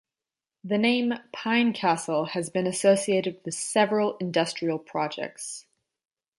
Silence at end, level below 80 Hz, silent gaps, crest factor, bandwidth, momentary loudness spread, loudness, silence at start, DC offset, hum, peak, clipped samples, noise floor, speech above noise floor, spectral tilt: 0.8 s; -74 dBFS; none; 18 dB; 11.5 kHz; 11 LU; -26 LUFS; 0.65 s; under 0.1%; none; -8 dBFS; under 0.1%; under -90 dBFS; over 64 dB; -4 dB/octave